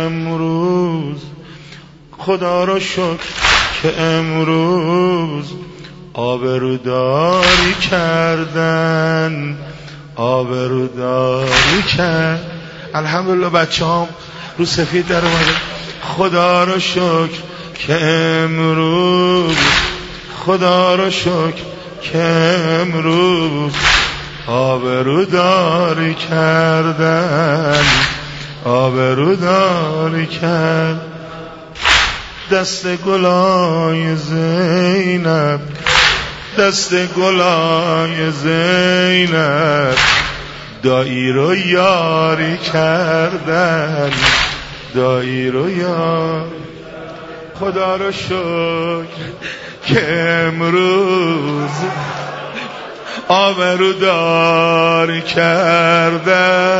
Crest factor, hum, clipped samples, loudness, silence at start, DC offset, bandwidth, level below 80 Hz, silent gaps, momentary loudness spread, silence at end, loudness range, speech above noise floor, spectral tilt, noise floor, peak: 14 dB; none; under 0.1%; -14 LUFS; 0 s; under 0.1%; 8 kHz; -38 dBFS; none; 14 LU; 0 s; 4 LU; 24 dB; -5 dB/octave; -37 dBFS; 0 dBFS